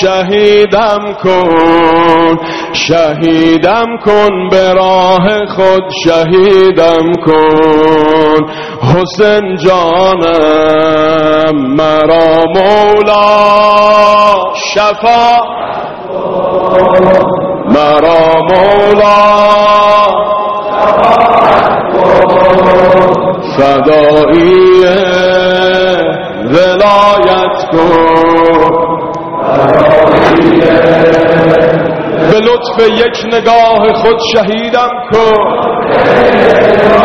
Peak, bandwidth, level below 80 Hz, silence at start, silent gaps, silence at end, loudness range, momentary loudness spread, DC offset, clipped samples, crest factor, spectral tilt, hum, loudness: 0 dBFS; 8.2 kHz; -36 dBFS; 0 s; none; 0 s; 2 LU; 6 LU; under 0.1%; 2%; 6 dB; -6 dB/octave; none; -7 LUFS